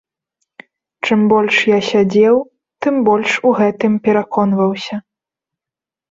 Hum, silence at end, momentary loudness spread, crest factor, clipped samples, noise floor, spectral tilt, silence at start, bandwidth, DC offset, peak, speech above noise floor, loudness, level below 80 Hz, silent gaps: none; 1.1 s; 11 LU; 14 dB; under 0.1%; -88 dBFS; -6 dB/octave; 1.05 s; 7.8 kHz; under 0.1%; -2 dBFS; 75 dB; -14 LUFS; -58 dBFS; none